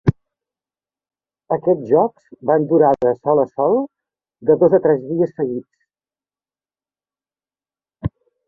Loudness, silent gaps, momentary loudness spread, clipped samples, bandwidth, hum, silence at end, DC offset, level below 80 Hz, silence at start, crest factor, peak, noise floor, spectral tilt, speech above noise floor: -17 LUFS; none; 15 LU; under 0.1%; 3.4 kHz; 50 Hz at -55 dBFS; 0.4 s; under 0.1%; -48 dBFS; 0.05 s; 18 dB; -2 dBFS; under -90 dBFS; -11 dB/octave; over 74 dB